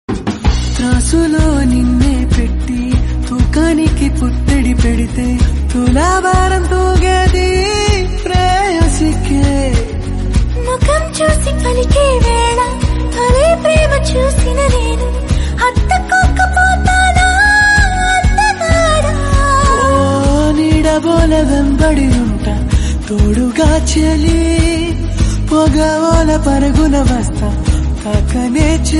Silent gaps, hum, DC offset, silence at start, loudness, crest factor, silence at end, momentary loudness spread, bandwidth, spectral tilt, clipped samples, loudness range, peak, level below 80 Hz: none; none; under 0.1%; 0.1 s; -12 LUFS; 10 dB; 0 s; 5 LU; 11.5 kHz; -5.5 dB/octave; under 0.1%; 3 LU; 0 dBFS; -14 dBFS